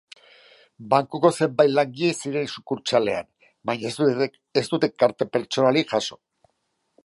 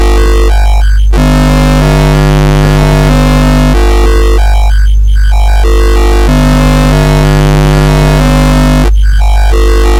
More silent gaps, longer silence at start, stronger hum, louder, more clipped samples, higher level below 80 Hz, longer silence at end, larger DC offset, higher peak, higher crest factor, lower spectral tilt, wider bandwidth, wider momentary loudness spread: neither; first, 0.8 s vs 0 s; second, none vs 50 Hz at -5 dBFS; second, -23 LUFS vs -7 LUFS; second, under 0.1% vs 0.3%; second, -68 dBFS vs -6 dBFS; first, 0.9 s vs 0 s; second, under 0.1% vs 3%; second, -4 dBFS vs 0 dBFS; first, 20 dB vs 4 dB; about the same, -5 dB/octave vs -6 dB/octave; second, 11.5 kHz vs 15 kHz; first, 9 LU vs 2 LU